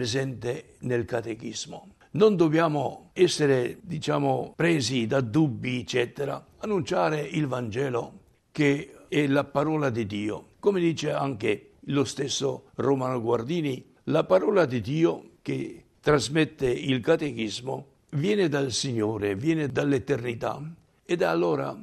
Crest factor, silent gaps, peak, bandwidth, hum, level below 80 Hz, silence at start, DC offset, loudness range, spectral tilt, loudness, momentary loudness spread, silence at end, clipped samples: 18 dB; none; -8 dBFS; 13 kHz; none; -60 dBFS; 0 s; under 0.1%; 3 LU; -5.5 dB/octave; -26 LUFS; 11 LU; 0 s; under 0.1%